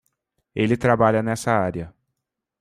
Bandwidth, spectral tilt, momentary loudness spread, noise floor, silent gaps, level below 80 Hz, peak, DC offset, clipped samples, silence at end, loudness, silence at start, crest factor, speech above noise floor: 14.5 kHz; -6.5 dB/octave; 16 LU; -81 dBFS; none; -52 dBFS; -4 dBFS; under 0.1%; under 0.1%; 0.7 s; -21 LUFS; 0.55 s; 20 dB; 61 dB